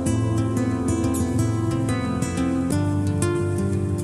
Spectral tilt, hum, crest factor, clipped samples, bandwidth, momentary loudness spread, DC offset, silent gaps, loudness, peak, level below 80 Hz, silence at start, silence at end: -6.5 dB/octave; none; 12 dB; under 0.1%; 13 kHz; 2 LU; under 0.1%; none; -23 LUFS; -10 dBFS; -40 dBFS; 0 s; 0 s